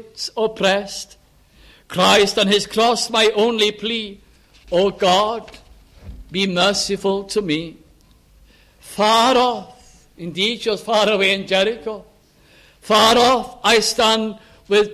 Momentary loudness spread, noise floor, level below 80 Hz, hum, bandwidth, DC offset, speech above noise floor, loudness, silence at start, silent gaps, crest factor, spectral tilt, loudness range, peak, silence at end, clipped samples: 16 LU; -52 dBFS; -50 dBFS; none; 15.5 kHz; under 0.1%; 34 dB; -17 LUFS; 0.15 s; none; 18 dB; -3 dB/octave; 4 LU; -2 dBFS; 0 s; under 0.1%